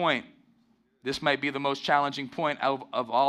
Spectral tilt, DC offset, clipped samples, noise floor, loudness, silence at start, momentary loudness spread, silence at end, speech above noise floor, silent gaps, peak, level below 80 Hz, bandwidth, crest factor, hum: -4.5 dB/octave; under 0.1%; under 0.1%; -67 dBFS; -28 LUFS; 0 s; 6 LU; 0 s; 39 dB; none; -8 dBFS; -68 dBFS; 13 kHz; 20 dB; none